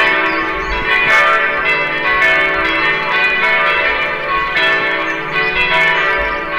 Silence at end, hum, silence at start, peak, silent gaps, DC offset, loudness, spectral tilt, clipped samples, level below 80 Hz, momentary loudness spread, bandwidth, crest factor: 0 s; none; 0 s; -2 dBFS; none; under 0.1%; -12 LUFS; -3.5 dB/octave; under 0.1%; -36 dBFS; 6 LU; over 20 kHz; 12 dB